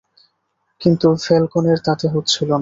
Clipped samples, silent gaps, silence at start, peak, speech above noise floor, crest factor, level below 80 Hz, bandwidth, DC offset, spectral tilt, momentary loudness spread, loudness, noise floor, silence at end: under 0.1%; none; 0.8 s; -2 dBFS; 53 dB; 16 dB; -54 dBFS; 7.8 kHz; under 0.1%; -6 dB/octave; 4 LU; -17 LUFS; -69 dBFS; 0 s